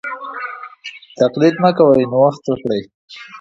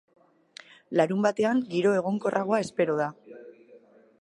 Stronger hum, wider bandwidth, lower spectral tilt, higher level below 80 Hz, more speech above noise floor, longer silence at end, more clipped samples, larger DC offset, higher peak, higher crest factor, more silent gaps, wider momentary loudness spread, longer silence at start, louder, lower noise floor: neither; second, 7.6 kHz vs 11 kHz; about the same, -7 dB/octave vs -6.5 dB/octave; first, -56 dBFS vs -74 dBFS; second, 22 dB vs 30 dB; second, 0 s vs 0.45 s; neither; neither; first, 0 dBFS vs -8 dBFS; about the same, 16 dB vs 20 dB; first, 2.94-3.08 s vs none; about the same, 21 LU vs 23 LU; second, 0.05 s vs 0.9 s; first, -15 LUFS vs -26 LUFS; second, -36 dBFS vs -55 dBFS